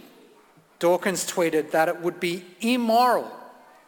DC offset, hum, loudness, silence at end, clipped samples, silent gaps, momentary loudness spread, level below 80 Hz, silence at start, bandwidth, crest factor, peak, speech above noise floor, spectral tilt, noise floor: under 0.1%; none; -23 LUFS; 0.35 s; under 0.1%; none; 9 LU; -72 dBFS; 0.8 s; 19 kHz; 18 dB; -8 dBFS; 33 dB; -4 dB/octave; -56 dBFS